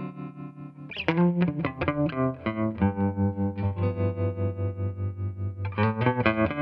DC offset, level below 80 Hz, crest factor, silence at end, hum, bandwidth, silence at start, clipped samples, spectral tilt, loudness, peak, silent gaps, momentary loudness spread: under 0.1%; -52 dBFS; 22 dB; 0 s; none; 5.4 kHz; 0 s; under 0.1%; -10 dB/octave; -27 LUFS; -4 dBFS; none; 13 LU